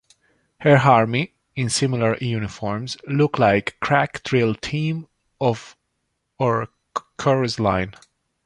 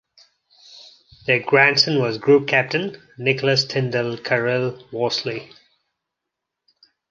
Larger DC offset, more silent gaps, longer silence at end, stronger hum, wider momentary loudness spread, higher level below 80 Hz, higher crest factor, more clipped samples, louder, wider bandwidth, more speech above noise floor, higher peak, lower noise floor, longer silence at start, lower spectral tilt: neither; neither; second, 0.55 s vs 1.65 s; neither; about the same, 12 LU vs 12 LU; first, -50 dBFS vs -66 dBFS; about the same, 20 dB vs 20 dB; neither; about the same, -21 LUFS vs -19 LUFS; first, 11.5 kHz vs 7.4 kHz; second, 55 dB vs 63 dB; about the same, -2 dBFS vs -2 dBFS; second, -74 dBFS vs -82 dBFS; about the same, 0.6 s vs 0.7 s; about the same, -5.5 dB/octave vs -5 dB/octave